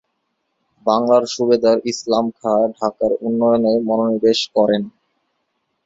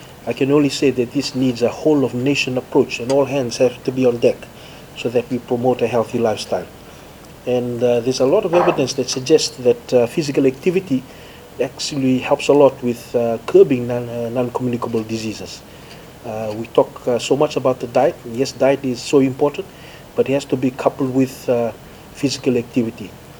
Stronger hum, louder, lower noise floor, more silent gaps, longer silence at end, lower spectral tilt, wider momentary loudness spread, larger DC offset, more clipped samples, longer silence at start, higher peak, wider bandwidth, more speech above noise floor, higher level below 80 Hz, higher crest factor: neither; about the same, -17 LUFS vs -18 LUFS; first, -71 dBFS vs -39 dBFS; neither; first, 0.95 s vs 0 s; about the same, -5 dB/octave vs -5.5 dB/octave; second, 5 LU vs 13 LU; neither; neither; first, 0.85 s vs 0 s; about the same, -2 dBFS vs 0 dBFS; second, 7.8 kHz vs over 20 kHz; first, 55 dB vs 22 dB; second, -58 dBFS vs -52 dBFS; about the same, 16 dB vs 18 dB